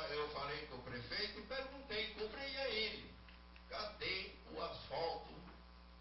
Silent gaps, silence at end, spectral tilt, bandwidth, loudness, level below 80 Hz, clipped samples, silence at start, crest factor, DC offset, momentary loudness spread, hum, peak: none; 0 s; -1 dB/octave; 5.8 kHz; -44 LUFS; -62 dBFS; under 0.1%; 0 s; 18 dB; under 0.1%; 17 LU; none; -28 dBFS